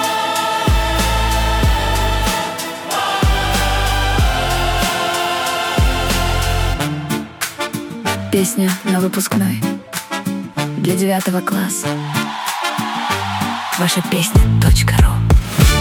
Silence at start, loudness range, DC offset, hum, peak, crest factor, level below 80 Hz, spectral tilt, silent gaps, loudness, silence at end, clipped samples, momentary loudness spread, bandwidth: 0 s; 3 LU; under 0.1%; none; 0 dBFS; 16 dB; -22 dBFS; -4.5 dB/octave; none; -17 LUFS; 0 s; under 0.1%; 9 LU; 18 kHz